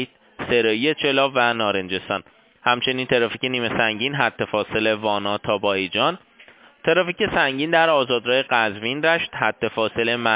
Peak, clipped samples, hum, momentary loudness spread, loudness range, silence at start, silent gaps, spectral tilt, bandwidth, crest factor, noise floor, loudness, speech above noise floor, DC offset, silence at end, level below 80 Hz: -2 dBFS; under 0.1%; none; 6 LU; 2 LU; 0 s; none; -8.5 dB/octave; 4 kHz; 20 dB; -50 dBFS; -20 LUFS; 29 dB; under 0.1%; 0 s; -56 dBFS